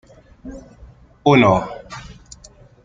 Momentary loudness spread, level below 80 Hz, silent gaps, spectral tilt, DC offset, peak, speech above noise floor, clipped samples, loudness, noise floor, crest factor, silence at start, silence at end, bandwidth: 27 LU; -46 dBFS; none; -6.5 dB/octave; under 0.1%; 0 dBFS; 30 dB; under 0.1%; -15 LUFS; -46 dBFS; 20 dB; 0.45 s; 0.7 s; 7.8 kHz